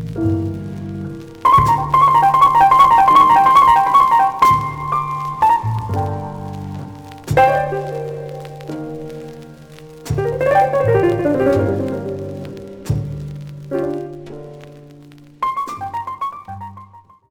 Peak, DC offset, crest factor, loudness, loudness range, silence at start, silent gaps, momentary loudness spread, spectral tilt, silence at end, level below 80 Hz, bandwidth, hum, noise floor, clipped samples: -2 dBFS; under 0.1%; 16 dB; -15 LUFS; 15 LU; 0 s; none; 22 LU; -6.5 dB/octave; 0.3 s; -42 dBFS; 19.5 kHz; none; -43 dBFS; under 0.1%